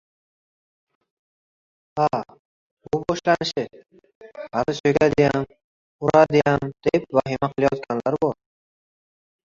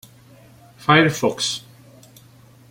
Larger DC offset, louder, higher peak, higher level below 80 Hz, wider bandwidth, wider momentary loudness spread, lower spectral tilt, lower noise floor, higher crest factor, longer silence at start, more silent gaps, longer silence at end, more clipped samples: neither; about the same, -21 LUFS vs -19 LUFS; about the same, -2 dBFS vs -2 dBFS; about the same, -54 dBFS vs -58 dBFS; second, 7.6 kHz vs 16.5 kHz; about the same, 13 LU vs 12 LU; first, -6.5 dB/octave vs -4 dB/octave; first, under -90 dBFS vs -49 dBFS; about the same, 20 dB vs 20 dB; first, 1.95 s vs 0.8 s; first, 2.39-2.77 s, 4.15-4.21 s, 4.80-4.84 s, 5.64-5.99 s vs none; about the same, 1.15 s vs 1.1 s; neither